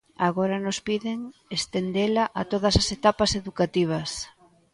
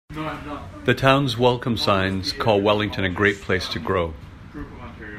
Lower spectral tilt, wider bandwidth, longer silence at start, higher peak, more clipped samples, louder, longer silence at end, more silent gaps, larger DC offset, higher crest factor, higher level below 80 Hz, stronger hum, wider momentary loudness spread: about the same, -4.5 dB/octave vs -5.5 dB/octave; second, 11.5 kHz vs 16 kHz; about the same, 0.2 s vs 0.1 s; about the same, -4 dBFS vs -2 dBFS; neither; second, -25 LUFS vs -21 LUFS; first, 0.45 s vs 0 s; neither; neither; about the same, 20 dB vs 20 dB; about the same, -44 dBFS vs -44 dBFS; neither; second, 10 LU vs 19 LU